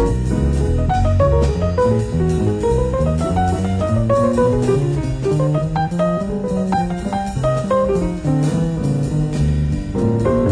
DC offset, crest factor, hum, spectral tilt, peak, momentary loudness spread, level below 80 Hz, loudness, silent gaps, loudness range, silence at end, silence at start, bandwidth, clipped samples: under 0.1%; 14 dB; none; -8 dB/octave; -4 dBFS; 4 LU; -26 dBFS; -18 LUFS; none; 2 LU; 0 s; 0 s; 10.5 kHz; under 0.1%